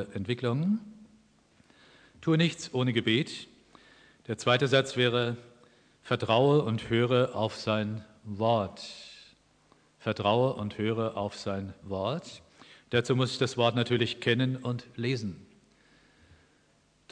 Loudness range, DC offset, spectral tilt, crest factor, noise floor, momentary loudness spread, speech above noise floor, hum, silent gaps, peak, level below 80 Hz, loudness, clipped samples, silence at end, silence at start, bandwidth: 4 LU; under 0.1%; -6 dB/octave; 20 dB; -66 dBFS; 15 LU; 38 dB; none; none; -10 dBFS; -66 dBFS; -29 LUFS; under 0.1%; 1.7 s; 0 s; 10 kHz